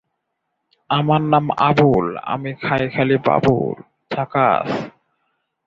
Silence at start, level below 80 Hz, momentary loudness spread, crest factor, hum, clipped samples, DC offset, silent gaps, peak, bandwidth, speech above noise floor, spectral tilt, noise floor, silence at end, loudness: 0.9 s; -50 dBFS; 11 LU; 18 dB; none; under 0.1%; under 0.1%; none; -2 dBFS; 7.2 kHz; 58 dB; -8 dB/octave; -75 dBFS; 0.75 s; -18 LUFS